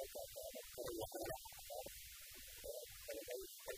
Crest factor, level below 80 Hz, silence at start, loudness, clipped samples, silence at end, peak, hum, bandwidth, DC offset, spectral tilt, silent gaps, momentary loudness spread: 18 dB; -66 dBFS; 0 s; -50 LUFS; under 0.1%; 0 s; -34 dBFS; none; 15.5 kHz; under 0.1%; -2.5 dB/octave; none; 6 LU